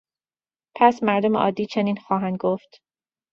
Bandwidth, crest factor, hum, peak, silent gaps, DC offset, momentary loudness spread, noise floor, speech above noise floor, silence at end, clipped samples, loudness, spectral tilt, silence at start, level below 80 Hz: 7.2 kHz; 20 dB; none; -2 dBFS; none; under 0.1%; 7 LU; under -90 dBFS; over 69 dB; 0.75 s; under 0.1%; -22 LUFS; -7 dB/octave; 0.75 s; -66 dBFS